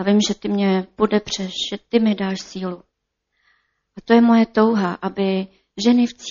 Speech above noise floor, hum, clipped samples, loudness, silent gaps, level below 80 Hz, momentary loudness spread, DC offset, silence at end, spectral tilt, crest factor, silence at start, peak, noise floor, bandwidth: 56 dB; none; under 0.1%; -19 LUFS; none; -56 dBFS; 14 LU; under 0.1%; 0 s; -5 dB/octave; 18 dB; 0 s; -2 dBFS; -75 dBFS; 7.4 kHz